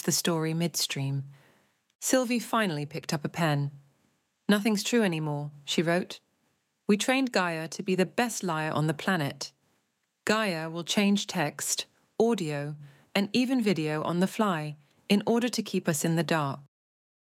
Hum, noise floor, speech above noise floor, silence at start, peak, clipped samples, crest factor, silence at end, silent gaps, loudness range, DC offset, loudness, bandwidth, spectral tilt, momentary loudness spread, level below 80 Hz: none; -76 dBFS; 48 dB; 0.05 s; -8 dBFS; under 0.1%; 20 dB; 0.7 s; 1.95-1.99 s; 2 LU; under 0.1%; -28 LUFS; 16.5 kHz; -4.5 dB/octave; 10 LU; -76 dBFS